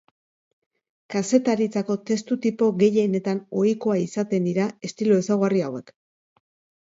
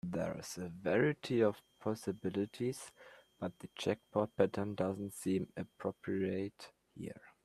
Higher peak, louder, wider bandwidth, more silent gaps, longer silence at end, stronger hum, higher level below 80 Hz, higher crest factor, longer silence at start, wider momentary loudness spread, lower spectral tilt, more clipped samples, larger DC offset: first, -6 dBFS vs -14 dBFS; first, -23 LUFS vs -38 LUFS; second, 8 kHz vs 14 kHz; neither; first, 1.05 s vs 0.15 s; neither; about the same, -70 dBFS vs -72 dBFS; second, 18 dB vs 24 dB; first, 1.1 s vs 0.05 s; second, 7 LU vs 15 LU; about the same, -6.5 dB/octave vs -6 dB/octave; neither; neither